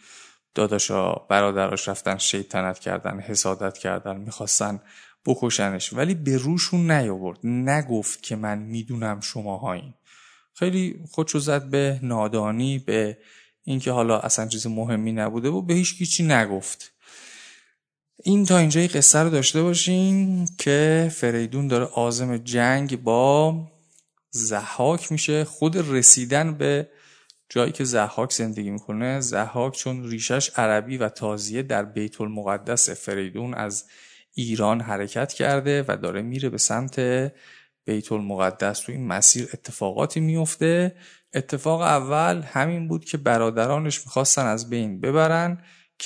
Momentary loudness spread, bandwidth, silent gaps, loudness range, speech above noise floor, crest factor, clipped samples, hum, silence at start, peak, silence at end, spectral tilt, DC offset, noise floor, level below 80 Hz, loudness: 11 LU; 11 kHz; none; 6 LU; 49 dB; 24 dB; under 0.1%; none; 0.1 s; 0 dBFS; 0 s; -4 dB/octave; under 0.1%; -71 dBFS; -66 dBFS; -22 LUFS